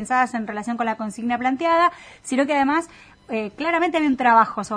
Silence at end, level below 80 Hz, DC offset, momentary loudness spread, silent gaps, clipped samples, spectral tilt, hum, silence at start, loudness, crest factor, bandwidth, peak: 0 s; -60 dBFS; under 0.1%; 12 LU; none; under 0.1%; -4.5 dB/octave; none; 0 s; -21 LUFS; 18 dB; 10.5 kHz; -4 dBFS